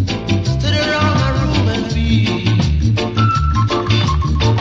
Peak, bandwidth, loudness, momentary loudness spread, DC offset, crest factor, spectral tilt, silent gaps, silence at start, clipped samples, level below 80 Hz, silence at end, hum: -2 dBFS; 7.6 kHz; -16 LUFS; 3 LU; under 0.1%; 12 dB; -6 dB/octave; none; 0 s; under 0.1%; -24 dBFS; 0 s; none